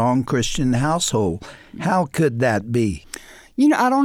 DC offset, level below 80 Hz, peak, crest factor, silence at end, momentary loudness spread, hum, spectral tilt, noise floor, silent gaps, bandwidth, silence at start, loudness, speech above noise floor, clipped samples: under 0.1%; -42 dBFS; -6 dBFS; 14 dB; 0 s; 15 LU; none; -5.5 dB/octave; -39 dBFS; none; 16.5 kHz; 0 s; -20 LUFS; 21 dB; under 0.1%